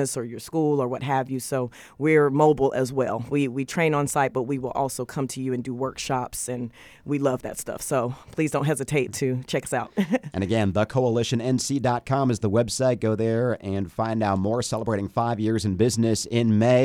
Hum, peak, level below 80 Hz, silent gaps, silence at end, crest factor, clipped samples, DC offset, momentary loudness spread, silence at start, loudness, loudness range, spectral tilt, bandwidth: none; -6 dBFS; -54 dBFS; none; 0 s; 18 dB; under 0.1%; under 0.1%; 8 LU; 0 s; -25 LUFS; 5 LU; -5.5 dB/octave; 19 kHz